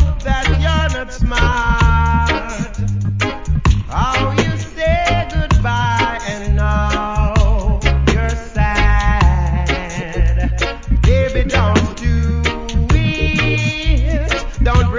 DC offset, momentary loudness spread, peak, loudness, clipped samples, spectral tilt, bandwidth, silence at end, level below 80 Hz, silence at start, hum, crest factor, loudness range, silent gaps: under 0.1%; 6 LU; 0 dBFS; -16 LUFS; under 0.1%; -6 dB/octave; 7.6 kHz; 0 s; -18 dBFS; 0 s; none; 14 dB; 1 LU; none